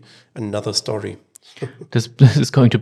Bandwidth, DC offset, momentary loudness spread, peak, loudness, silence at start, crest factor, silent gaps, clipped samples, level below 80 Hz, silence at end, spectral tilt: 12.5 kHz; under 0.1%; 19 LU; 0 dBFS; -17 LUFS; 0.35 s; 18 dB; none; under 0.1%; -56 dBFS; 0 s; -6 dB/octave